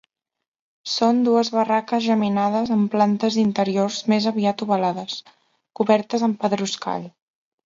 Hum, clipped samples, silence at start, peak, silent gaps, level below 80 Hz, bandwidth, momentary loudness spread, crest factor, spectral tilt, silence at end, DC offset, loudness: none; under 0.1%; 0.85 s; -4 dBFS; none; -66 dBFS; 7.6 kHz; 10 LU; 18 dB; -5.5 dB/octave; 0.55 s; under 0.1%; -21 LUFS